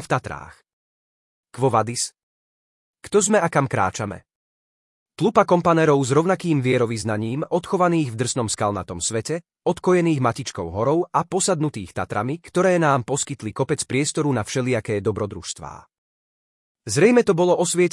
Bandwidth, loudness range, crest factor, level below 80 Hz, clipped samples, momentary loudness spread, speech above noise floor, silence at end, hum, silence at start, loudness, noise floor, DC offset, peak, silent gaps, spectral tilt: 12 kHz; 4 LU; 20 dB; -58 dBFS; under 0.1%; 11 LU; over 69 dB; 0.05 s; none; 0 s; -21 LUFS; under -90 dBFS; under 0.1%; -2 dBFS; 0.73-1.44 s, 2.23-2.94 s, 4.35-5.06 s, 15.98-16.75 s; -5 dB/octave